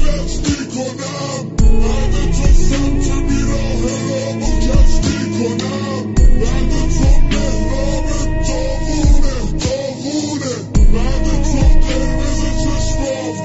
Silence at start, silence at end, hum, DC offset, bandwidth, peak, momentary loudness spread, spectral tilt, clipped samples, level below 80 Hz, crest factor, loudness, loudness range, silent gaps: 0 s; 0 s; none; under 0.1%; 8 kHz; -2 dBFS; 5 LU; -5.5 dB/octave; under 0.1%; -14 dBFS; 12 dB; -17 LUFS; 1 LU; none